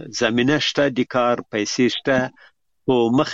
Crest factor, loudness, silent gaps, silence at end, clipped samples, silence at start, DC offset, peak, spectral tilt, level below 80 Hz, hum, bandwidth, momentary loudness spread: 18 dB; -20 LUFS; none; 0 s; under 0.1%; 0 s; under 0.1%; -2 dBFS; -4.5 dB/octave; -56 dBFS; none; 7.8 kHz; 5 LU